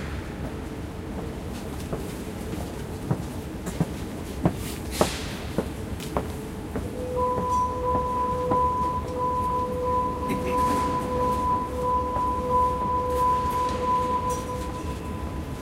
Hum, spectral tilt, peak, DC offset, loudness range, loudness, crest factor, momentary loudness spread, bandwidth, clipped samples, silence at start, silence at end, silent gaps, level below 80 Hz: none; -6 dB/octave; -2 dBFS; under 0.1%; 8 LU; -27 LUFS; 24 dB; 11 LU; 16 kHz; under 0.1%; 0 s; 0 s; none; -38 dBFS